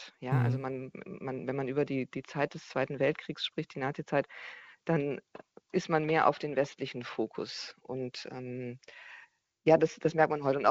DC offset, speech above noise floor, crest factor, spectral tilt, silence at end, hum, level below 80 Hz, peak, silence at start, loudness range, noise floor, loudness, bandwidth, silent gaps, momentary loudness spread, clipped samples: under 0.1%; 28 dB; 22 dB; -6.5 dB/octave; 0 s; none; -70 dBFS; -10 dBFS; 0 s; 2 LU; -60 dBFS; -32 LUFS; 8 kHz; none; 15 LU; under 0.1%